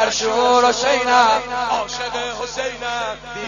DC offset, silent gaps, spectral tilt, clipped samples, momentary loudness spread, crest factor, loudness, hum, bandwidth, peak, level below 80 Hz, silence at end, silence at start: under 0.1%; none; -1.5 dB/octave; under 0.1%; 10 LU; 18 dB; -18 LUFS; none; 10 kHz; 0 dBFS; -48 dBFS; 0 s; 0 s